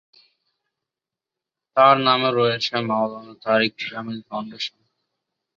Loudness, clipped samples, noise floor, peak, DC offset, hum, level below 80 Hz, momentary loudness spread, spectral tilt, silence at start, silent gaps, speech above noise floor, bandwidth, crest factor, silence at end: -20 LUFS; under 0.1%; -88 dBFS; -2 dBFS; under 0.1%; none; -68 dBFS; 15 LU; -5.5 dB/octave; 1.75 s; none; 67 dB; 7.4 kHz; 22 dB; 0.9 s